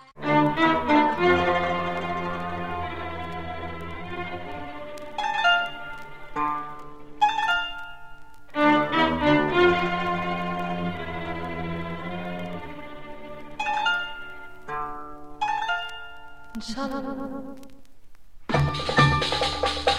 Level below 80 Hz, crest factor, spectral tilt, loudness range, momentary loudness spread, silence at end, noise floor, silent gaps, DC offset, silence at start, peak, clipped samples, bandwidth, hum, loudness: -46 dBFS; 22 dB; -5.5 dB/octave; 9 LU; 20 LU; 0 s; -48 dBFS; none; 1%; 0 s; -4 dBFS; under 0.1%; 15 kHz; none; -25 LUFS